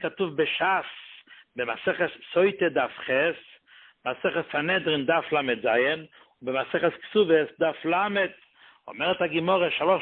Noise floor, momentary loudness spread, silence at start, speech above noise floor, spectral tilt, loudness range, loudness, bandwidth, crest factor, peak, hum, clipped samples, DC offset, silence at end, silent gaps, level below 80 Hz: -55 dBFS; 10 LU; 0 s; 30 dB; -9 dB/octave; 2 LU; -25 LUFS; 4.4 kHz; 18 dB; -8 dBFS; none; under 0.1%; under 0.1%; 0 s; none; -68 dBFS